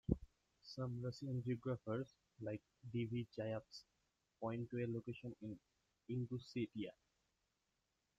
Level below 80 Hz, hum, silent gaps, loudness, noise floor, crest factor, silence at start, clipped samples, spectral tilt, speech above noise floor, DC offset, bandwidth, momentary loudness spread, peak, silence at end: -64 dBFS; none; none; -47 LUFS; -87 dBFS; 26 dB; 0.1 s; under 0.1%; -8 dB/octave; 41 dB; under 0.1%; 7.8 kHz; 10 LU; -22 dBFS; 1.25 s